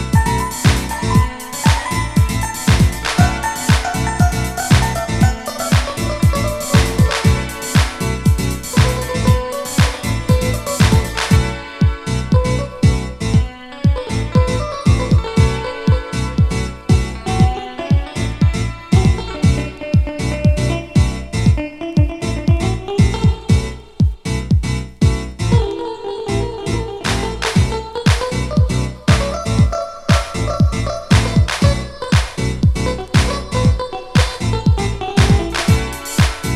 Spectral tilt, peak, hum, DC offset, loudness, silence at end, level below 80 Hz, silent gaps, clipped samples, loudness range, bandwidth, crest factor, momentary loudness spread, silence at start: -5.5 dB/octave; 0 dBFS; none; under 0.1%; -17 LUFS; 0 s; -22 dBFS; none; under 0.1%; 2 LU; 15.5 kHz; 16 dB; 6 LU; 0 s